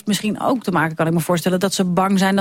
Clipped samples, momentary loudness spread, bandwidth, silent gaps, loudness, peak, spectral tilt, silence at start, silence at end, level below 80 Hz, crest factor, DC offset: under 0.1%; 4 LU; 16.5 kHz; none; -19 LUFS; -4 dBFS; -5 dB/octave; 0.05 s; 0 s; -54 dBFS; 14 dB; under 0.1%